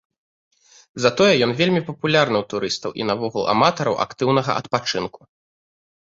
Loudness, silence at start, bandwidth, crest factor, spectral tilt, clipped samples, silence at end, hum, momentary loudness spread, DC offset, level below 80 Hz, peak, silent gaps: -20 LUFS; 0.95 s; 8 kHz; 20 dB; -5 dB/octave; under 0.1%; 1.05 s; none; 9 LU; under 0.1%; -58 dBFS; -2 dBFS; none